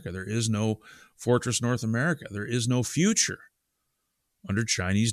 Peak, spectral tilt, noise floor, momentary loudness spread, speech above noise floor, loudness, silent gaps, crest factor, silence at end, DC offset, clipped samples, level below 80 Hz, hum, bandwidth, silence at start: -10 dBFS; -4.5 dB/octave; -78 dBFS; 8 LU; 51 dB; -27 LUFS; none; 18 dB; 0 s; under 0.1%; under 0.1%; -60 dBFS; none; 14.5 kHz; 0 s